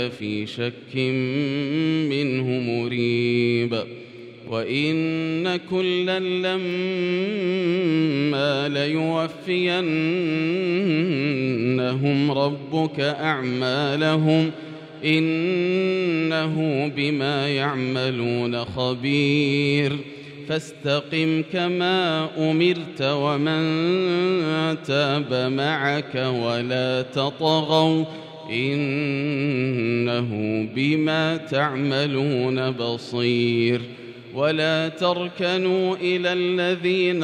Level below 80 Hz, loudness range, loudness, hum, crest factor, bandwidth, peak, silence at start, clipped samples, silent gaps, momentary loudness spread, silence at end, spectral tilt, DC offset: -66 dBFS; 2 LU; -22 LUFS; none; 16 dB; 10 kHz; -6 dBFS; 0 s; under 0.1%; none; 6 LU; 0 s; -6.5 dB/octave; under 0.1%